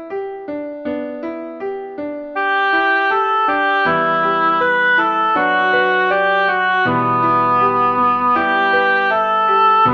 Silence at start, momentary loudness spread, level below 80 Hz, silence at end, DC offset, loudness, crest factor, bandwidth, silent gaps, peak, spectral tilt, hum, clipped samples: 0 s; 12 LU; -58 dBFS; 0 s; under 0.1%; -15 LUFS; 12 dB; 6.6 kHz; none; -4 dBFS; -6.5 dB/octave; none; under 0.1%